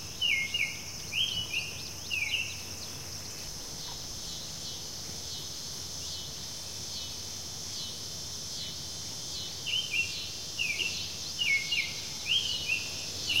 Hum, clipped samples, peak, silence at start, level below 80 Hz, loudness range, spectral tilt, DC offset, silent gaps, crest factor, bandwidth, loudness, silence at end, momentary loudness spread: none; under 0.1%; -16 dBFS; 0 s; -56 dBFS; 7 LU; -0.5 dB/octave; 0.3%; none; 18 dB; 16 kHz; -32 LUFS; 0 s; 10 LU